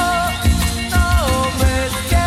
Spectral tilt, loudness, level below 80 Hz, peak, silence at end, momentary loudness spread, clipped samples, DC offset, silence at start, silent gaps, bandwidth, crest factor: -4.5 dB/octave; -17 LUFS; -20 dBFS; -4 dBFS; 0 s; 2 LU; under 0.1%; under 0.1%; 0 s; none; 16 kHz; 12 dB